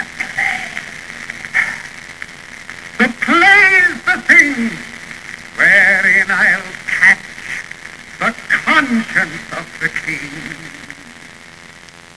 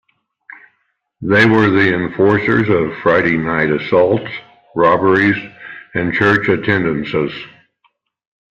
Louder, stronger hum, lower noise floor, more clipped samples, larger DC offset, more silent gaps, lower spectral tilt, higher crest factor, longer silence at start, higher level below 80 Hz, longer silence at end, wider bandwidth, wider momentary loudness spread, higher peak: about the same, -12 LUFS vs -14 LUFS; neither; second, -38 dBFS vs -66 dBFS; first, 0.1% vs under 0.1%; first, 0.4% vs under 0.1%; neither; second, -3 dB/octave vs -7.5 dB/octave; about the same, 16 dB vs 14 dB; second, 0 s vs 1.2 s; about the same, -52 dBFS vs -50 dBFS; second, 0.6 s vs 1.05 s; first, 11 kHz vs 7.6 kHz; first, 22 LU vs 14 LU; about the same, 0 dBFS vs 0 dBFS